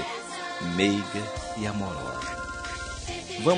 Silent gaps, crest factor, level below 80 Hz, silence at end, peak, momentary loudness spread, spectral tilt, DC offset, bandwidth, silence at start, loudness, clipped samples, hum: none; 22 dB; -46 dBFS; 0 s; -8 dBFS; 9 LU; -4.5 dB/octave; under 0.1%; 10 kHz; 0 s; -30 LUFS; under 0.1%; none